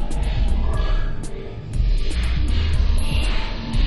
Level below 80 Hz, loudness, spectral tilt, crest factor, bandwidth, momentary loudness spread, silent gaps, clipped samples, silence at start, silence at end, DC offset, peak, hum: -20 dBFS; -24 LUFS; -6 dB/octave; 12 dB; 11.5 kHz; 8 LU; none; under 0.1%; 0 s; 0 s; under 0.1%; -8 dBFS; none